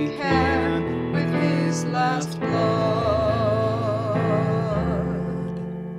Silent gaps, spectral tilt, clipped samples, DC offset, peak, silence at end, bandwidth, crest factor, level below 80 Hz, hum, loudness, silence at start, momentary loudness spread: none; -7 dB/octave; under 0.1%; under 0.1%; -8 dBFS; 0 s; 11.5 kHz; 14 dB; -42 dBFS; none; -23 LUFS; 0 s; 5 LU